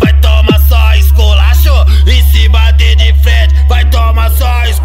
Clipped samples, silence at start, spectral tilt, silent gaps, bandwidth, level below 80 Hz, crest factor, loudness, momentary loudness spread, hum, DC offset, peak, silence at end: 0.3%; 0 s; -5.5 dB/octave; none; 16.5 kHz; -6 dBFS; 6 dB; -8 LUFS; 2 LU; none; under 0.1%; 0 dBFS; 0 s